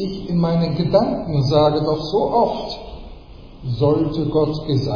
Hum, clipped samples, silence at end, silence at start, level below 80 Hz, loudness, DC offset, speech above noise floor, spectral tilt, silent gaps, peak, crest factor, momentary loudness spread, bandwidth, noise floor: none; under 0.1%; 0 s; 0 s; -38 dBFS; -19 LUFS; under 0.1%; 21 dB; -8.5 dB/octave; none; -2 dBFS; 16 dB; 13 LU; 5.2 kHz; -39 dBFS